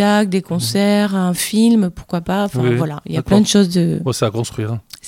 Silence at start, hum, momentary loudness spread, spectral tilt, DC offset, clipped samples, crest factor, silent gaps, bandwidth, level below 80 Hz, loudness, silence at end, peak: 0 s; none; 9 LU; -5.5 dB/octave; under 0.1%; under 0.1%; 16 dB; none; 16.5 kHz; -44 dBFS; -16 LUFS; 0 s; 0 dBFS